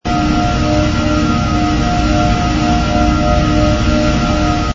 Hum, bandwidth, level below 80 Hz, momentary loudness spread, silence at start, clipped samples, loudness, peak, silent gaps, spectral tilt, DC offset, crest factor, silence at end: none; 7.8 kHz; -20 dBFS; 1 LU; 0.05 s; under 0.1%; -14 LUFS; 0 dBFS; none; -6 dB/octave; under 0.1%; 12 dB; 0 s